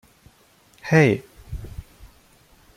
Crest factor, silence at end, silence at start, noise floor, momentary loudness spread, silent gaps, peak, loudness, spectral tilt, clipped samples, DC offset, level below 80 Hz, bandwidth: 22 dB; 0.95 s; 0.85 s; -57 dBFS; 23 LU; none; -4 dBFS; -19 LUFS; -7 dB/octave; under 0.1%; under 0.1%; -44 dBFS; 15 kHz